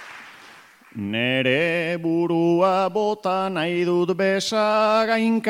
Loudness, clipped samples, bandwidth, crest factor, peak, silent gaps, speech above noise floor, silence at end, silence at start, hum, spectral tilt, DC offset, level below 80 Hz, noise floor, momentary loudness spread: -21 LUFS; under 0.1%; 15.5 kHz; 16 dB; -6 dBFS; none; 27 dB; 0 s; 0 s; none; -5.5 dB/octave; under 0.1%; -72 dBFS; -48 dBFS; 7 LU